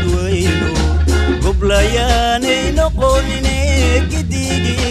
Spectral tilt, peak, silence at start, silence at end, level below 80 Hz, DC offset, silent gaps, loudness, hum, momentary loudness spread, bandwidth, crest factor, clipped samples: -5 dB/octave; 0 dBFS; 0 s; 0 s; -18 dBFS; under 0.1%; none; -15 LUFS; none; 3 LU; 13.5 kHz; 14 dB; under 0.1%